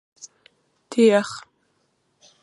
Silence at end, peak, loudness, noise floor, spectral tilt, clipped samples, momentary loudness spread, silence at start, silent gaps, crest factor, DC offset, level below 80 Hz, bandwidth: 1.05 s; -6 dBFS; -20 LUFS; -68 dBFS; -5 dB/octave; under 0.1%; 27 LU; 0.9 s; none; 20 dB; under 0.1%; -74 dBFS; 11.5 kHz